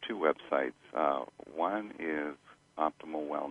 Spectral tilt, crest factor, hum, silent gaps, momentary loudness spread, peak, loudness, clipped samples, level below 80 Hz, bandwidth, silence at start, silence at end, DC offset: -6 dB/octave; 22 dB; none; none; 10 LU; -14 dBFS; -34 LUFS; under 0.1%; -74 dBFS; 10.5 kHz; 0 s; 0 s; under 0.1%